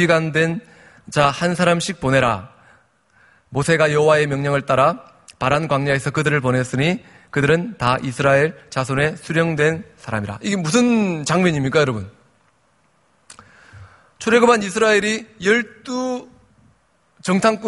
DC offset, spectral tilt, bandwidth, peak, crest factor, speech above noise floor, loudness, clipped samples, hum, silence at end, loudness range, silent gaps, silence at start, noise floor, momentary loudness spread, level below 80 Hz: under 0.1%; -5.5 dB/octave; 11.5 kHz; 0 dBFS; 20 dB; 43 dB; -18 LUFS; under 0.1%; none; 0 s; 2 LU; none; 0 s; -61 dBFS; 11 LU; -50 dBFS